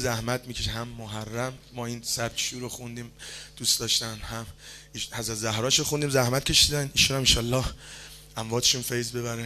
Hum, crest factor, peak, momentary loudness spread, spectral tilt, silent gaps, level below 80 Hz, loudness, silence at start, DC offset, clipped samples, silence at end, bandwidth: none; 22 dB; -6 dBFS; 19 LU; -2.5 dB/octave; none; -44 dBFS; -25 LUFS; 0 s; under 0.1%; under 0.1%; 0 s; 14 kHz